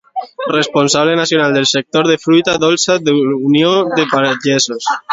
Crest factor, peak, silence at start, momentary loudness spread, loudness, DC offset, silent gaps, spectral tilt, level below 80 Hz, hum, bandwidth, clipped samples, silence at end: 12 dB; 0 dBFS; 0.15 s; 4 LU; -13 LUFS; under 0.1%; none; -3.5 dB/octave; -56 dBFS; none; 7.8 kHz; under 0.1%; 0 s